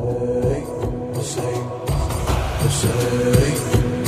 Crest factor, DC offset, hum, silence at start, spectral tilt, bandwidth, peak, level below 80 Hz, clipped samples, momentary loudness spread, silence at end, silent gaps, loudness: 18 dB; under 0.1%; none; 0 s; -5.5 dB/octave; 15.5 kHz; -2 dBFS; -30 dBFS; under 0.1%; 8 LU; 0 s; none; -21 LUFS